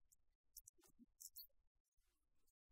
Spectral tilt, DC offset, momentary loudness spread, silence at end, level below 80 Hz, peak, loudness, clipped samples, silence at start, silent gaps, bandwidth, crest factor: -0.5 dB/octave; under 0.1%; 7 LU; 0.2 s; -86 dBFS; -40 dBFS; -62 LUFS; under 0.1%; 0 s; 0.35-0.44 s, 0.69-0.74 s, 1.67-1.92 s; 16 kHz; 30 dB